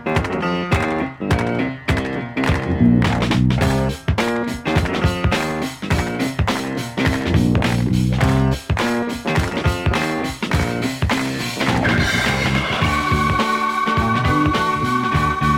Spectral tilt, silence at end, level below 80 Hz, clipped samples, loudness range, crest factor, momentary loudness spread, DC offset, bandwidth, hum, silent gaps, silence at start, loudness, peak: -6 dB/octave; 0 s; -30 dBFS; under 0.1%; 2 LU; 16 dB; 5 LU; under 0.1%; 16.5 kHz; none; none; 0 s; -19 LUFS; -2 dBFS